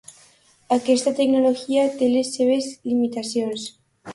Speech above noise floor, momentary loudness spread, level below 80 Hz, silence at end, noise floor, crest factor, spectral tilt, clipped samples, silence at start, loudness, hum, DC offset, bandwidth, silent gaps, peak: 35 dB; 7 LU; -66 dBFS; 0 s; -55 dBFS; 16 dB; -4 dB/octave; under 0.1%; 0.1 s; -21 LUFS; none; under 0.1%; 11.5 kHz; none; -6 dBFS